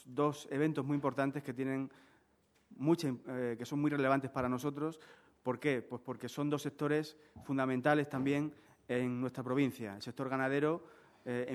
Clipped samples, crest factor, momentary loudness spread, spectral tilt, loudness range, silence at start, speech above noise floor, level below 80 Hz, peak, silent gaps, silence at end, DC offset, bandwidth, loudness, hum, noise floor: under 0.1%; 20 dB; 10 LU; -7 dB/octave; 2 LU; 0.05 s; 37 dB; -74 dBFS; -16 dBFS; none; 0 s; under 0.1%; 14 kHz; -36 LUFS; none; -72 dBFS